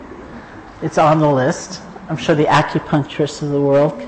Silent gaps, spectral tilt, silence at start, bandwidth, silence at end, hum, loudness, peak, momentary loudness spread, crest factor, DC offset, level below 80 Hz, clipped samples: none; -6 dB/octave; 0 s; 8.8 kHz; 0 s; none; -16 LUFS; -4 dBFS; 21 LU; 14 dB; under 0.1%; -46 dBFS; under 0.1%